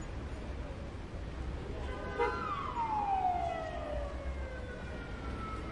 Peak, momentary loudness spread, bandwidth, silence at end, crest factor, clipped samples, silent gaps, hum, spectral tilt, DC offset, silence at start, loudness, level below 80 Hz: -20 dBFS; 10 LU; 11 kHz; 0 s; 18 dB; under 0.1%; none; none; -6.5 dB/octave; under 0.1%; 0 s; -38 LUFS; -44 dBFS